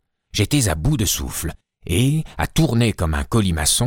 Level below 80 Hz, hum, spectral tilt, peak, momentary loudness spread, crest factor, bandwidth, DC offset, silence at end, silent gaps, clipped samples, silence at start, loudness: -30 dBFS; none; -4.5 dB/octave; -4 dBFS; 9 LU; 16 dB; 17.5 kHz; under 0.1%; 0 s; none; under 0.1%; 0.35 s; -20 LUFS